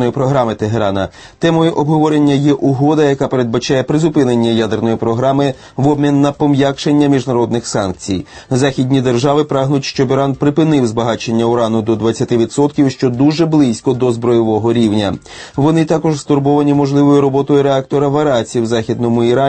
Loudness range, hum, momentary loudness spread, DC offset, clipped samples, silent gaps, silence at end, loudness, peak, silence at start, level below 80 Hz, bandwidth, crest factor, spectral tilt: 2 LU; none; 5 LU; under 0.1%; under 0.1%; none; 0 s; -13 LUFS; 0 dBFS; 0 s; -46 dBFS; 8.8 kHz; 12 dB; -6.5 dB/octave